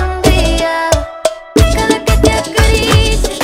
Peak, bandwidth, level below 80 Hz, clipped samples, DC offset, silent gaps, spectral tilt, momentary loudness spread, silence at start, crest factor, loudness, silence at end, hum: 0 dBFS; 16.5 kHz; -16 dBFS; 0.6%; under 0.1%; none; -4.5 dB/octave; 4 LU; 0 s; 12 dB; -12 LUFS; 0 s; none